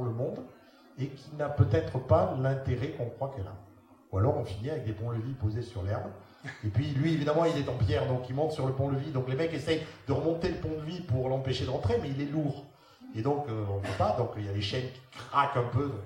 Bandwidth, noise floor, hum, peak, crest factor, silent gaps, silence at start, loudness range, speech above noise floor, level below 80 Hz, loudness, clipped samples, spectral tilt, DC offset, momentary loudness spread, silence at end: 10.5 kHz; -56 dBFS; none; -10 dBFS; 20 dB; none; 0 s; 4 LU; 25 dB; -54 dBFS; -31 LUFS; under 0.1%; -7.5 dB/octave; under 0.1%; 11 LU; 0 s